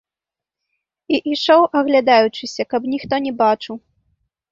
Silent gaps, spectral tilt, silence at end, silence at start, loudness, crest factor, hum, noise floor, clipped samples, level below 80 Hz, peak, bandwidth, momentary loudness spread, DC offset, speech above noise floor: none; -4.5 dB/octave; 0.75 s; 1.1 s; -17 LUFS; 16 dB; none; -88 dBFS; under 0.1%; -60 dBFS; -2 dBFS; 7.6 kHz; 10 LU; under 0.1%; 71 dB